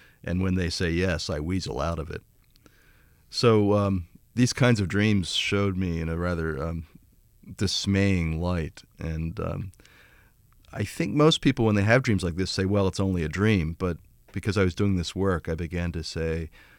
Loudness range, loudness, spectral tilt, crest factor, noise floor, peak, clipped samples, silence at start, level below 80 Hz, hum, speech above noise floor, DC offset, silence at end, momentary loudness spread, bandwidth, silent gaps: 5 LU; -26 LUFS; -6 dB/octave; 20 dB; -58 dBFS; -6 dBFS; under 0.1%; 0.25 s; -44 dBFS; none; 33 dB; under 0.1%; 0.3 s; 12 LU; 16 kHz; none